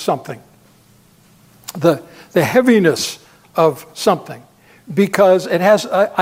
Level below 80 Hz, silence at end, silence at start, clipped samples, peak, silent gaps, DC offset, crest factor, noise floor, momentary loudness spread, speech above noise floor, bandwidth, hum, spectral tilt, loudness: -60 dBFS; 0 s; 0 s; under 0.1%; 0 dBFS; none; under 0.1%; 16 dB; -50 dBFS; 21 LU; 35 dB; 16 kHz; none; -5 dB/octave; -16 LUFS